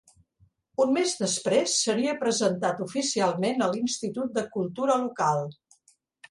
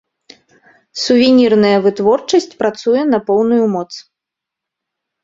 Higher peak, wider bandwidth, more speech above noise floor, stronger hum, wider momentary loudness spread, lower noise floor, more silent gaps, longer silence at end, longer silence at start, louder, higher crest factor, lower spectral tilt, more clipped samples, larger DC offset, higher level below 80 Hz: second, -10 dBFS vs 0 dBFS; first, 11.5 kHz vs 7.8 kHz; second, 39 dB vs 70 dB; neither; second, 6 LU vs 12 LU; second, -65 dBFS vs -82 dBFS; neither; second, 0.75 s vs 1.25 s; second, 0.8 s vs 0.95 s; second, -26 LUFS vs -13 LUFS; about the same, 16 dB vs 14 dB; second, -3.5 dB/octave vs -5 dB/octave; neither; neither; second, -70 dBFS vs -56 dBFS